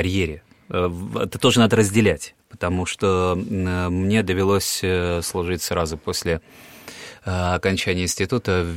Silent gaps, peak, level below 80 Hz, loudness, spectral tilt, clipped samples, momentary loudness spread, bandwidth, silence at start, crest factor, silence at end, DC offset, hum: none; -2 dBFS; -42 dBFS; -21 LUFS; -5 dB/octave; under 0.1%; 12 LU; 16.5 kHz; 0 s; 18 dB; 0 s; 0.2%; none